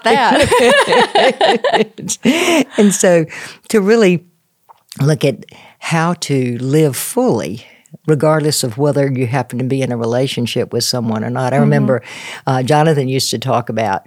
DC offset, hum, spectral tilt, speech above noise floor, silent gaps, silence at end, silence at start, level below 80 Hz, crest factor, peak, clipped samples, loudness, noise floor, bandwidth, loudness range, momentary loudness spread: under 0.1%; none; -5 dB/octave; 36 dB; none; 0.1 s; 0.05 s; -50 dBFS; 14 dB; 0 dBFS; under 0.1%; -14 LUFS; -50 dBFS; 18 kHz; 4 LU; 8 LU